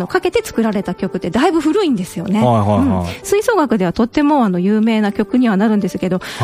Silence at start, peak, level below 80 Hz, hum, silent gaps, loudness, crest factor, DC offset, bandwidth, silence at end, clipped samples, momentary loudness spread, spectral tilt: 0 s; 0 dBFS; -44 dBFS; none; none; -15 LUFS; 14 dB; under 0.1%; 15.5 kHz; 0 s; under 0.1%; 6 LU; -6.5 dB/octave